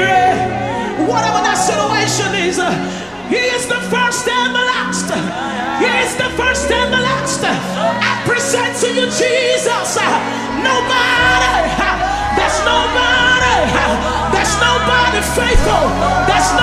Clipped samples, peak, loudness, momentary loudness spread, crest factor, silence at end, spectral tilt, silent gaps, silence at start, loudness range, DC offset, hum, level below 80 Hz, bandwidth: under 0.1%; 0 dBFS; -14 LUFS; 6 LU; 14 dB; 0 s; -3 dB/octave; none; 0 s; 3 LU; 0.2%; none; -28 dBFS; 15 kHz